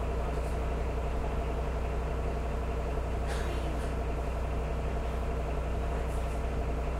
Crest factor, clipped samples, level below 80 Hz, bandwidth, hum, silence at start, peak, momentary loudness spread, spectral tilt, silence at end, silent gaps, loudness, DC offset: 12 dB; under 0.1%; -34 dBFS; 12 kHz; none; 0 s; -20 dBFS; 1 LU; -7 dB/octave; 0 s; none; -34 LUFS; under 0.1%